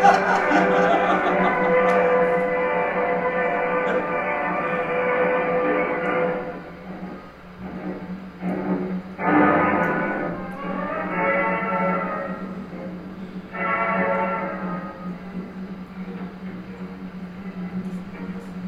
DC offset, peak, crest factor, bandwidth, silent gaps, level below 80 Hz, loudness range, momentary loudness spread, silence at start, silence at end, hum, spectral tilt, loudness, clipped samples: under 0.1%; -4 dBFS; 20 dB; 8.2 kHz; none; -54 dBFS; 10 LU; 17 LU; 0 s; 0 s; none; -7 dB/octave; -22 LUFS; under 0.1%